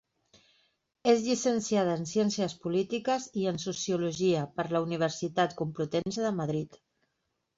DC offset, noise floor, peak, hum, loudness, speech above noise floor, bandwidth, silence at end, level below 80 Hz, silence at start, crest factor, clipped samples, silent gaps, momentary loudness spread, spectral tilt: under 0.1%; -80 dBFS; -12 dBFS; none; -30 LUFS; 51 dB; 8 kHz; 0.8 s; -68 dBFS; 1.05 s; 18 dB; under 0.1%; none; 5 LU; -5 dB/octave